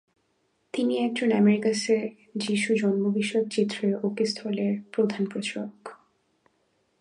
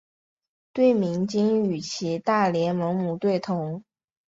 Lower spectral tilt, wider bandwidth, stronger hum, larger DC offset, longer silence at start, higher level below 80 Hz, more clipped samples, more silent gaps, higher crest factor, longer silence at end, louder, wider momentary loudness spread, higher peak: about the same, -5.5 dB/octave vs -6.5 dB/octave; first, 11 kHz vs 7.8 kHz; neither; neither; about the same, 0.75 s vs 0.75 s; second, -76 dBFS vs -66 dBFS; neither; neither; about the same, 16 dB vs 16 dB; first, 1.05 s vs 0.5 s; about the same, -26 LUFS vs -24 LUFS; first, 12 LU vs 8 LU; about the same, -10 dBFS vs -8 dBFS